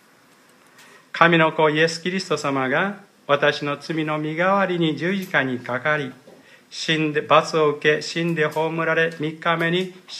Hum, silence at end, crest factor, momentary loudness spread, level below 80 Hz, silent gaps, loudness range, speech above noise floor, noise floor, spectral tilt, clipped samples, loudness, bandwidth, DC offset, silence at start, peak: none; 0 s; 22 dB; 9 LU; -72 dBFS; none; 2 LU; 33 dB; -54 dBFS; -5 dB/octave; under 0.1%; -21 LUFS; 14 kHz; under 0.1%; 1.15 s; 0 dBFS